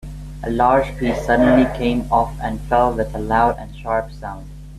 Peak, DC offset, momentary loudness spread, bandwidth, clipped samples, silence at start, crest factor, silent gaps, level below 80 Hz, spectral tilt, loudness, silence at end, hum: -2 dBFS; under 0.1%; 16 LU; 13.5 kHz; under 0.1%; 0 s; 16 dB; none; -32 dBFS; -7 dB/octave; -18 LUFS; 0 s; none